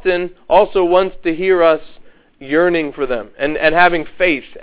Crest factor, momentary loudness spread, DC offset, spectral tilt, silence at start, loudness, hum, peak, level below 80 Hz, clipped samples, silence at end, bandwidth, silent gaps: 16 dB; 9 LU; under 0.1%; -9 dB/octave; 0.05 s; -15 LUFS; none; 0 dBFS; -42 dBFS; under 0.1%; 0 s; 4 kHz; none